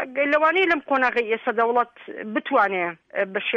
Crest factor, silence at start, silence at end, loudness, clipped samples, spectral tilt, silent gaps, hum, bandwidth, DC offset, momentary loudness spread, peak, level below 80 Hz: 14 dB; 0 s; 0 s; -22 LUFS; under 0.1%; -5.5 dB/octave; none; none; 7.6 kHz; under 0.1%; 10 LU; -8 dBFS; -66 dBFS